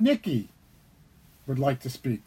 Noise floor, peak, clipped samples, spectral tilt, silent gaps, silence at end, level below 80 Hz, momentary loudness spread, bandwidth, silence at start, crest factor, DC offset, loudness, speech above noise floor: -57 dBFS; -10 dBFS; under 0.1%; -7 dB/octave; none; 0.05 s; -60 dBFS; 17 LU; 16.5 kHz; 0 s; 18 dB; under 0.1%; -29 LUFS; 31 dB